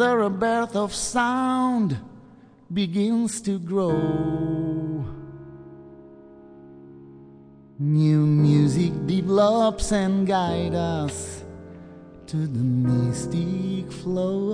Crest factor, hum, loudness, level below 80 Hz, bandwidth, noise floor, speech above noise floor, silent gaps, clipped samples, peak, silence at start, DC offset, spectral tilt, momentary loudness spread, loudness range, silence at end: 16 dB; none; -23 LUFS; -46 dBFS; 10 kHz; -50 dBFS; 28 dB; none; under 0.1%; -8 dBFS; 0 s; under 0.1%; -6.5 dB/octave; 20 LU; 9 LU; 0 s